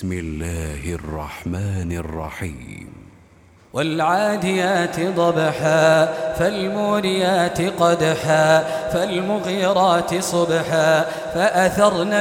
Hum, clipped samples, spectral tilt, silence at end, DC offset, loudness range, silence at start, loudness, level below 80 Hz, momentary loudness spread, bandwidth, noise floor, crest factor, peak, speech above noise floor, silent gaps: none; under 0.1%; -5 dB/octave; 0 s; under 0.1%; 10 LU; 0 s; -19 LUFS; -42 dBFS; 12 LU; 17.5 kHz; -50 dBFS; 18 dB; -2 dBFS; 31 dB; none